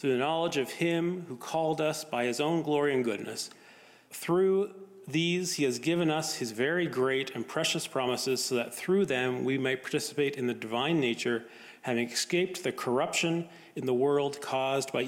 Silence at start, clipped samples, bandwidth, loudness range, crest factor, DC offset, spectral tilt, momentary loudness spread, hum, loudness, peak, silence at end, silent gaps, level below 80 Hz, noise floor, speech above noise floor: 0 s; under 0.1%; 16.5 kHz; 1 LU; 14 dB; under 0.1%; -4 dB/octave; 7 LU; none; -30 LUFS; -16 dBFS; 0 s; none; -78 dBFS; -56 dBFS; 26 dB